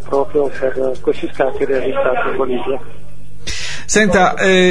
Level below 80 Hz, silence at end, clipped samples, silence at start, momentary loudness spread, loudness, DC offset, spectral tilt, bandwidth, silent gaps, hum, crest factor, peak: -38 dBFS; 0 s; under 0.1%; 0 s; 12 LU; -16 LUFS; 10%; -4 dB/octave; 10.5 kHz; none; 50 Hz at -40 dBFS; 16 dB; 0 dBFS